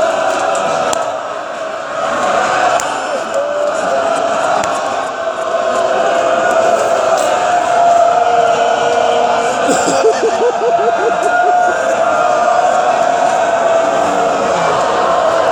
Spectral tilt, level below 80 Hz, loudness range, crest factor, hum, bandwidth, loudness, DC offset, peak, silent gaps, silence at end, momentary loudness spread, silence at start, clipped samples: -2.5 dB/octave; -54 dBFS; 4 LU; 12 dB; none; 13 kHz; -13 LUFS; under 0.1%; 0 dBFS; none; 0 s; 6 LU; 0 s; under 0.1%